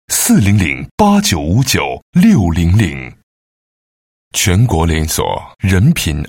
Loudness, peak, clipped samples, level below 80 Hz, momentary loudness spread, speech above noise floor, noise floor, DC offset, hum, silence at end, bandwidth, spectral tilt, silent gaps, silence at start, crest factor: -13 LUFS; 0 dBFS; under 0.1%; -28 dBFS; 8 LU; over 78 dB; under -90 dBFS; 0.1%; none; 0 s; 16.5 kHz; -5 dB/octave; 0.91-0.98 s, 2.02-2.13 s, 3.23-4.31 s; 0.1 s; 12 dB